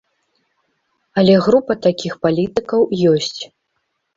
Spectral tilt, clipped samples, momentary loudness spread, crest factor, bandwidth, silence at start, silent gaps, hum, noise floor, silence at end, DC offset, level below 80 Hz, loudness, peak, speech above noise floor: -6.5 dB/octave; under 0.1%; 11 LU; 16 dB; 7.6 kHz; 1.15 s; none; none; -71 dBFS; 0.7 s; under 0.1%; -54 dBFS; -16 LUFS; -2 dBFS; 56 dB